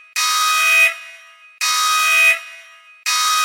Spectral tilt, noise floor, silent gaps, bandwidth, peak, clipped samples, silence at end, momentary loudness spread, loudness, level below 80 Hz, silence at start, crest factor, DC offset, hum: 9 dB/octave; -43 dBFS; none; 16.5 kHz; -2 dBFS; under 0.1%; 0 s; 10 LU; -14 LUFS; under -90 dBFS; 0.15 s; 16 dB; under 0.1%; none